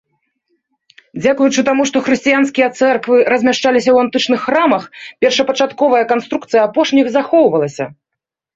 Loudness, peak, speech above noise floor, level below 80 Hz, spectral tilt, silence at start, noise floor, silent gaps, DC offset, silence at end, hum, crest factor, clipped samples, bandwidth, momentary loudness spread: -13 LUFS; -2 dBFS; 67 dB; -58 dBFS; -4 dB/octave; 1.15 s; -80 dBFS; none; under 0.1%; 0.65 s; none; 12 dB; under 0.1%; 7.8 kHz; 6 LU